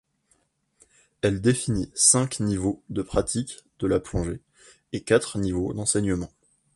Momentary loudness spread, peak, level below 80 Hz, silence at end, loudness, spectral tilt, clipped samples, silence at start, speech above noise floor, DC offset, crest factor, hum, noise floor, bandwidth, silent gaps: 15 LU; -4 dBFS; -44 dBFS; 0.5 s; -24 LUFS; -4 dB/octave; under 0.1%; 1.25 s; 44 dB; under 0.1%; 22 dB; none; -68 dBFS; 11.5 kHz; none